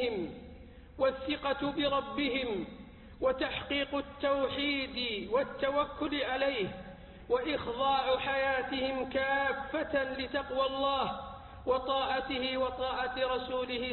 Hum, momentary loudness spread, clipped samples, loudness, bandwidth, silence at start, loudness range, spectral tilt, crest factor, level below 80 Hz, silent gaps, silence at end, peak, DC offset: none; 10 LU; under 0.1%; -33 LUFS; 4.4 kHz; 0 s; 2 LU; -8 dB/octave; 16 dB; -54 dBFS; none; 0 s; -18 dBFS; under 0.1%